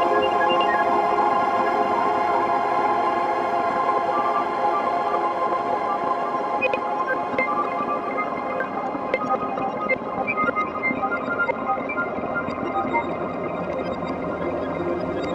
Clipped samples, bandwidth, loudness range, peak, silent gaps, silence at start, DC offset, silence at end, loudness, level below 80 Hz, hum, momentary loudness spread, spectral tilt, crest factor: under 0.1%; 11.5 kHz; 4 LU; -6 dBFS; none; 0 s; under 0.1%; 0 s; -23 LUFS; -56 dBFS; none; 7 LU; -6 dB/octave; 16 dB